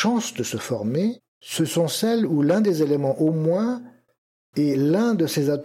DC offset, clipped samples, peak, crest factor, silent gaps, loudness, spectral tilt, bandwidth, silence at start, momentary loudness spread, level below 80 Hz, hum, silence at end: under 0.1%; under 0.1%; -8 dBFS; 14 dB; 1.28-1.41 s, 4.18-4.53 s; -22 LUFS; -5.5 dB/octave; 16.5 kHz; 0 s; 7 LU; -72 dBFS; none; 0 s